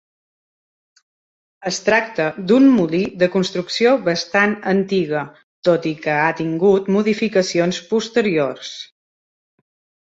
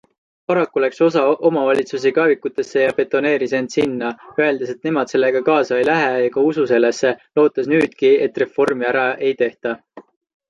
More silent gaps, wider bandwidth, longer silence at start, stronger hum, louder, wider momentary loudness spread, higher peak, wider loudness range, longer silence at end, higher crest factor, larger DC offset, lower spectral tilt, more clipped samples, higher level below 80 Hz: first, 5.43-5.62 s vs none; second, 8 kHz vs 10.5 kHz; first, 1.6 s vs 0.5 s; neither; about the same, -18 LUFS vs -17 LUFS; first, 10 LU vs 6 LU; about the same, -2 dBFS vs -2 dBFS; about the same, 2 LU vs 2 LU; first, 1.2 s vs 0.5 s; about the same, 18 dB vs 14 dB; neither; about the same, -5 dB/octave vs -5.5 dB/octave; neither; first, -60 dBFS vs -66 dBFS